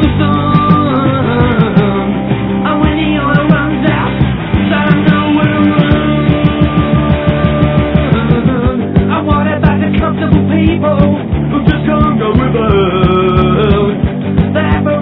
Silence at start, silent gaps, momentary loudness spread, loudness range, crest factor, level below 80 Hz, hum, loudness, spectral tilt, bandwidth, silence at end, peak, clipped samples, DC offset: 0 s; none; 3 LU; 1 LU; 10 dB; -22 dBFS; none; -11 LUFS; -11 dB/octave; 5 kHz; 0 s; 0 dBFS; 1%; under 0.1%